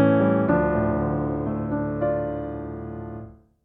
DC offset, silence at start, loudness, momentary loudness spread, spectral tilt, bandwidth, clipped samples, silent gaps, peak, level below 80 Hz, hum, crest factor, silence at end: under 0.1%; 0 s; -24 LUFS; 15 LU; -11.5 dB/octave; 3.9 kHz; under 0.1%; none; -8 dBFS; -42 dBFS; none; 16 dB; 0.3 s